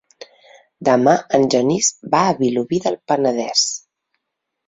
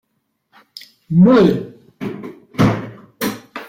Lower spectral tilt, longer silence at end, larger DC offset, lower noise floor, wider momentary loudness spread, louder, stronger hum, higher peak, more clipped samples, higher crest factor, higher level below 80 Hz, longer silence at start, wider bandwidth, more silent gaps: second, -3.5 dB/octave vs -7.5 dB/octave; first, 0.9 s vs 0 s; neither; first, -78 dBFS vs -69 dBFS; second, 6 LU vs 25 LU; about the same, -17 LUFS vs -15 LUFS; neither; about the same, 0 dBFS vs -2 dBFS; neither; about the same, 18 dB vs 16 dB; second, -60 dBFS vs -46 dBFS; second, 0.2 s vs 1.1 s; second, 8.2 kHz vs 16.5 kHz; neither